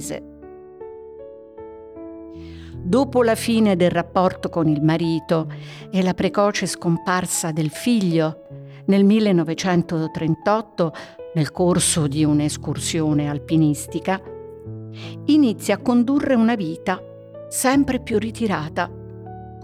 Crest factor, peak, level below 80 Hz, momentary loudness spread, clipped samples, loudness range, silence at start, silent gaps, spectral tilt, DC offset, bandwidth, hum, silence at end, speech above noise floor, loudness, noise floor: 16 dB; -6 dBFS; -48 dBFS; 20 LU; under 0.1%; 2 LU; 0 s; none; -5.5 dB/octave; under 0.1%; 16 kHz; none; 0 s; 20 dB; -20 LUFS; -40 dBFS